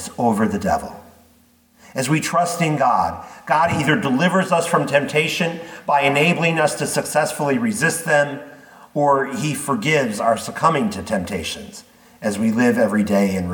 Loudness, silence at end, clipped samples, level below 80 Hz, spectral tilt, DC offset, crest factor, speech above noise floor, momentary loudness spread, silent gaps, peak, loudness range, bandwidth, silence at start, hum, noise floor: -19 LUFS; 0 s; under 0.1%; -54 dBFS; -5 dB/octave; under 0.1%; 18 dB; 36 dB; 9 LU; none; -2 dBFS; 3 LU; 19 kHz; 0 s; none; -55 dBFS